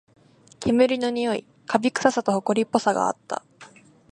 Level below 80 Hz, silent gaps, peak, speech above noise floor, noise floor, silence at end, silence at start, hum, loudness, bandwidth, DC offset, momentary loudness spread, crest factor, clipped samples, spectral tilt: -58 dBFS; none; -2 dBFS; 27 dB; -50 dBFS; 0.5 s; 0.6 s; none; -23 LUFS; 10.5 kHz; under 0.1%; 11 LU; 22 dB; under 0.1%; -4.5 dB/octave